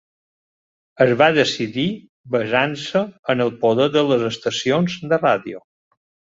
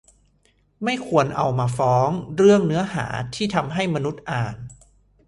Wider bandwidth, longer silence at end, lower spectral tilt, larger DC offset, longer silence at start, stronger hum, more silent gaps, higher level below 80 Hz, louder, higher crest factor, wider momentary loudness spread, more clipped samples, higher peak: second, 7.8 kHz vs 11.5 kHz; first, 0.8 s vs 0.55 s; second, -5 dB/octave vs -6.5 dB/octave; neither; first, 1 s vs 0.8 s; neither; first, 2.09-2.24 s, 3.19-3.23 s vs none; second, -60 dBFS vs -52 dBFS; about the same, -19 LUFS vs -21 LUFS; about the same, 18 dB vs 20 dB; second, 9 LU vs 12 LU; neither; about the same, -2 dBFS vs -2 dBFS